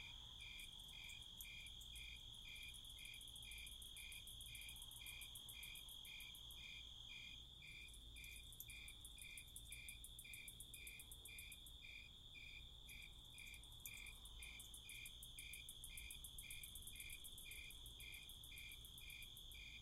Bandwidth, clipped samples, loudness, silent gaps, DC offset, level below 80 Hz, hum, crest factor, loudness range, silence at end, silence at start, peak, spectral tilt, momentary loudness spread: 16 kHz; under 0.1%; -55 LUFS; none; under 0.1%; -64 dBFS; none; 22 dB; 2 LU; 0 s; 0 s; -34 dBFS; -0.5 dB/octave; 3 LU